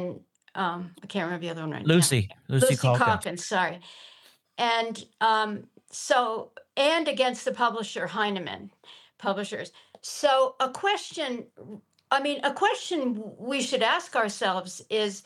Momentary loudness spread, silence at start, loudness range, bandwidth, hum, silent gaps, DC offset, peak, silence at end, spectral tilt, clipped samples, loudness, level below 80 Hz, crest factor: 15 LU; 0 s; 4 LU; 13 kHz; none; none; under 0.1%; -6 dBFS; 0.05 s; -4 dB/octave; under 0.1%; -26 LUFS; -74 dBFS; 22 dB